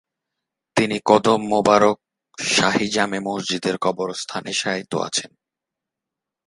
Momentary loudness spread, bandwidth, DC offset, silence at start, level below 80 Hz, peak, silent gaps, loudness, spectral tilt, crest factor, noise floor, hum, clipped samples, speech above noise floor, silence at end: 10 LU; 11.5 kHz; under 0.1%; 0.75 s; -60 dBFS; 0 dBFS; none; -20 LUFS; -3.5 dB/octave; 22 dB; -85 dBFS; none; under 0.1%; 65 dB; 1.2 s